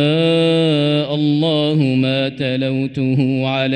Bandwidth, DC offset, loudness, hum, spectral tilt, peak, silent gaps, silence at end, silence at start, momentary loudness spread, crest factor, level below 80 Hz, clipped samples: 9.4 kHz; under 0.1%; -16 LUFS; none; -7.5 dB/octave; -4 dBFS; none; 0 s; 0 s; 5 LU; 12 dB; -56 dBFS; under 0.1%